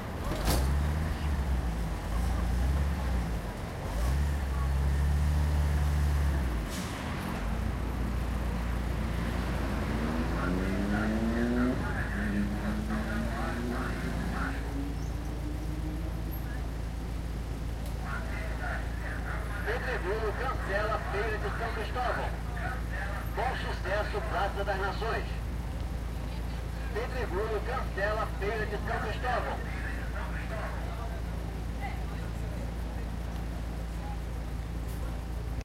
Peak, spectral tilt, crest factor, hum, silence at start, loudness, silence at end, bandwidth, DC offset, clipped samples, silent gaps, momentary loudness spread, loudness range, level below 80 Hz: -14 dBFS; -6.5 dB/octave; 16 dB; none; 0 s; -33 LUFS; 0 s; 16 kHz; under 0.1%; under 0.1%; none; 8 LU; 6 LU; -34 dBFS